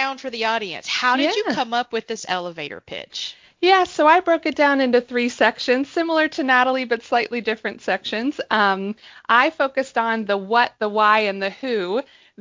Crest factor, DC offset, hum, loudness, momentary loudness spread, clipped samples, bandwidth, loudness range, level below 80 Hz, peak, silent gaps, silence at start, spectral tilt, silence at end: 20 dB; under 0.1%; none; -20 LUFS; 11 LU; under 0.1%; 7.6 kHz; 3 LU; -66 dBFS; -2 dBFS; none; 0 s; -3.5 dB/octave; 0.4 s